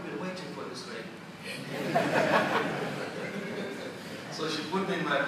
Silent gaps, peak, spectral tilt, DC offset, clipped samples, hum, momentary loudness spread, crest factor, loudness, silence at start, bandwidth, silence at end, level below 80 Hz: none; -12 dBFS; -5 dB/octave; under 0.1%; under 0.1%; none; 14 LU; 20 dB; -32 LUFS; 0 s; 15.5 kHz; 0 s; -76 dBFS